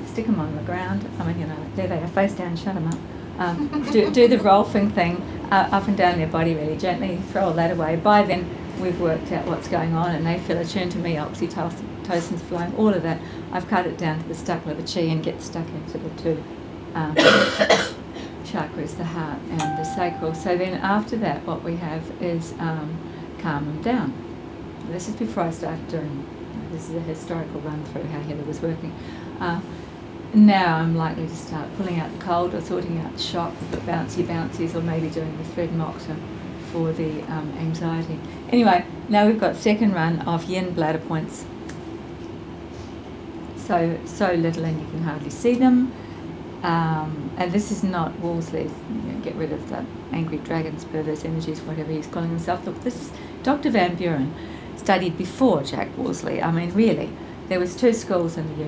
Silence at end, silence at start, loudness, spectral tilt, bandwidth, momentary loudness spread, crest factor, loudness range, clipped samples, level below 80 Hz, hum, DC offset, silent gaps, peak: 0 s; 0 s; -23 LUFS; -6.5 dB/octave; 8 kHz; 14 LU; 22 dB; 8 LU; under 0.1%; -46 dBFS; none; under 0.1%; none; -2 dBFS